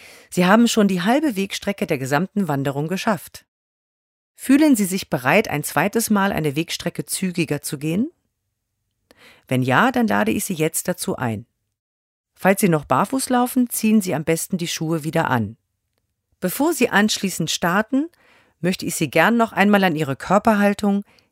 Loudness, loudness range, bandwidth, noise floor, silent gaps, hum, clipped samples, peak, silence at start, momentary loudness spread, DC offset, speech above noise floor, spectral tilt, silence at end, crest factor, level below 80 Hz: -20 LUFS; 4 LU; 16 kHz; -76 dBFS; 3.48-4.35 s, 11.79-12.24 s; none; under 0.1%; 0 dBFS; 0.05 s; 9 LU; under 0.1%; 56 dB; -5 dB/octave; 0.3 s; 20 dB; -56 dBFS